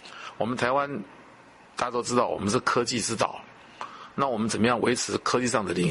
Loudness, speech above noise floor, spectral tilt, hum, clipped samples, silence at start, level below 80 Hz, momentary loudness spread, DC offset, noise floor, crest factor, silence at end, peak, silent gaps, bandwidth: -26 LUFS; 26 dB; -4 dB/octave; none; under 0.1%; 0.05 s; -60 dBFS; 16 LU; under 0.1%; -52 dBFS; 20 dB; 0 s; -6 dBFS; none; 11.5 kHz